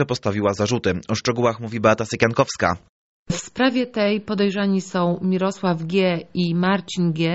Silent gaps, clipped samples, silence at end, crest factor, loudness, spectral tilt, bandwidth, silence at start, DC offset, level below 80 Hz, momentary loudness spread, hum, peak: 2.89-3.26 s; under 0.1%; 0 s; 20 dB; -21 LUFS; -5 dB/octave; 8 kHz; 0 s; under 0.1%; -52 dBFS; 4 LU; none; -2 dBFS